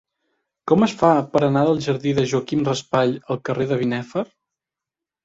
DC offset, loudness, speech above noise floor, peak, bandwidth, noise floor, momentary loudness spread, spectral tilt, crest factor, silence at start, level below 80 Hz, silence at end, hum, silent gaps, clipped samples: under 0.1%; -20 LUFS; 68 dB; -2 dBFS; 8 kHz; -87 dBFS; 10 LU; -6.5 dB/octave; 18 dB; 0.65 s; -56 dBFS; 1 s; none; none; under 0.1%